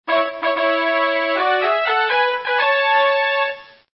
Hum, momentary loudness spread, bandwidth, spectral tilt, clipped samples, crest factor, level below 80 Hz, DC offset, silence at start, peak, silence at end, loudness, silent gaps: none; 5 LU; 5.8 kHz; -6 dB/octave; under 0.1%; 12 dB; -70 dBFS; under 0.1%; 0.05 s; -6 dBFS; 0.3 s; -17 LUFS; none